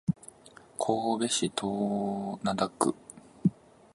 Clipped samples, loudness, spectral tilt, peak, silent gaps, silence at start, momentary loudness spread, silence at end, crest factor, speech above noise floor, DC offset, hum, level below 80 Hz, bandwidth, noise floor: under 0.1%; -30 LUFS; -5 dB/octave; -10 dBFS; none; 0.1 s; 15 LU; 0.4 s; 22 dB; 25 dB; under 0.1%; none; -64 dBFS; 11.5 kHz; -55 dBFS